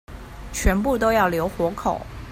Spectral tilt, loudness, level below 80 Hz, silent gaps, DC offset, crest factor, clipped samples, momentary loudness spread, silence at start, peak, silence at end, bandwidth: -5.5 dB/octave; -22 LUFS; -32 dBFS; none; under 0.1%; 18 dB; under 0.1%; 14 LU; 0.1 s; -4 dBFS; 0 s; 16 kHz